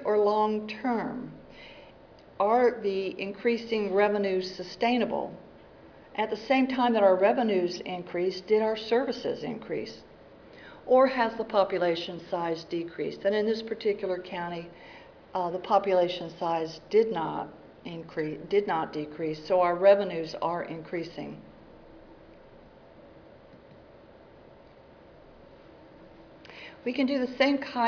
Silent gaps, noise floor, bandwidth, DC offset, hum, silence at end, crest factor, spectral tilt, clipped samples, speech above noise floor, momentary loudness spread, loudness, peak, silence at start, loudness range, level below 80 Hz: none; -53 dBFS; 5.4 kHz; under 0.1%; none; 0 s; 20 dB; -6 dB/octave; under 0.1%; 26 dB; 18 LU; -28 LUFS; -10 dBFS; 0 s; 5 LU; -64 dBFS